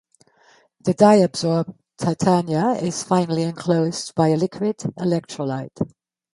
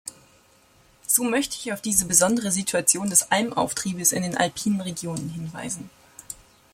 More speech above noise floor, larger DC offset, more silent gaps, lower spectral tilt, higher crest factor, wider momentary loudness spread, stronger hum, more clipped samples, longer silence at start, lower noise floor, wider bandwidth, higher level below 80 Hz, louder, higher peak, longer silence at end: first, 37 dB vs 33 dB; neither; neither; first, -6 dB/octave vs -3 dB/octave; about the same, 20 dB vs 24 dB; second, 11 LU vs 20 LU; neither; neither; first, 0.85 s vs 0.05 s; about the same, -56 dBFS vs -57 dBFS; second, 11.5 kHz vs 16.5 kHz; about the same, -60 dBFS vs -58 dBFS; about the same, -21 LUFS vs -22 LUFS; about the same, -2 dBFS vs -2 dBFS; about the same, 0.45 s vs 0.4 s